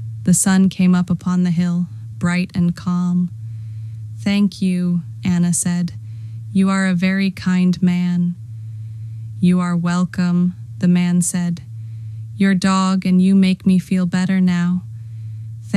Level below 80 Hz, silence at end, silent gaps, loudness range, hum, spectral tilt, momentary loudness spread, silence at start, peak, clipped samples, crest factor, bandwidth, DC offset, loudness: -54 dBFS; 0 s; none; 4 LU; none; -6 dB/octave; 16 LU; 0 s; -4 dBFS; under 0.1%; 14 dB; 13 kHz; under 0.1%; -17 LUFS